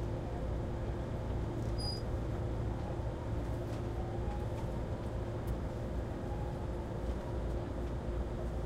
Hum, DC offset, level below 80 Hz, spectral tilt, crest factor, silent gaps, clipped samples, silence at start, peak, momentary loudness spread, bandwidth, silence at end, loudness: none; under 0.1%; -42 dBFS; -7.5 dB/octave; 12 dB; none; under 0.1%; 0 s; -24 dBFS; 2 LU; 12.5 kHz; 0 s; -39 LUFS